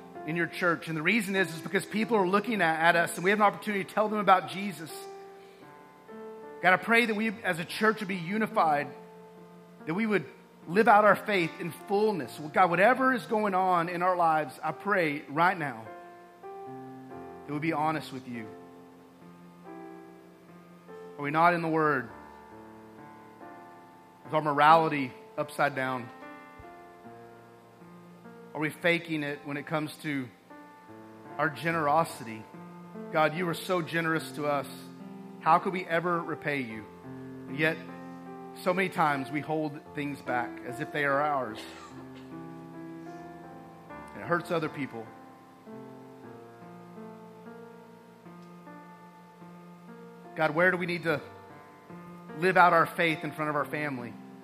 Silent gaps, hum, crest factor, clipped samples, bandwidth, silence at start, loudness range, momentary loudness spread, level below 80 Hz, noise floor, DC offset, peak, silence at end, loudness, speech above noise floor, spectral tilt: none; 60 Hz at -65 dBFS; 24 dB; under 0.1%; 15.5 kHz; 0 s; 11 LU; 24 LU; -76 dBFS; -53 dBFS; under 0.1%; -6 dBFS; 0 s; -28 LUFS; 25 dB; -5.5 dB/octave